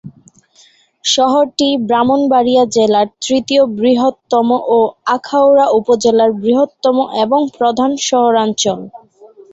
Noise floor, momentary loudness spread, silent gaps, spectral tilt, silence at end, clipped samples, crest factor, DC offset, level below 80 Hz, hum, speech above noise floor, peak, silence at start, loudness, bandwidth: -49 dBFS; 4 LU; none; -3.5 dB/octave; 0.25 s; under 0.1%; 12 dB; under 0.1%; -56 dBFS; none; 37 dB; 0 dBFS; 0.05 s; -13 LUFS; 8.2 kHz